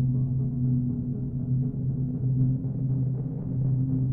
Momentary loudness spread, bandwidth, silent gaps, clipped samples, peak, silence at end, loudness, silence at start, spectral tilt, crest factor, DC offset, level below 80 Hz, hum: 5 LU; 1.2 kHz; none; under 0.1%; -14 dBFS; 0 s; -28 LUFS; 0 s; -15 dB/octave; 12 dB; under 0.1%; -44 dBFS; none